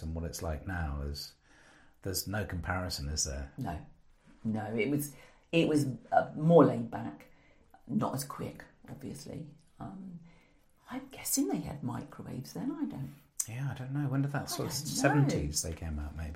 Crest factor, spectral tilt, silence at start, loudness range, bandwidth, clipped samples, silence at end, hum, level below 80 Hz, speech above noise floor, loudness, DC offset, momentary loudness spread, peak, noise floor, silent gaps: 24 dB; -5 dB/octave; 0 s; 11 LU; 16 kHz; under 0.1%; 0 s; none; -48 dBFS; 31 dB; -33 LUFS; under 0.1%; 17 LU; -10 dBFS; -64 dBFS; none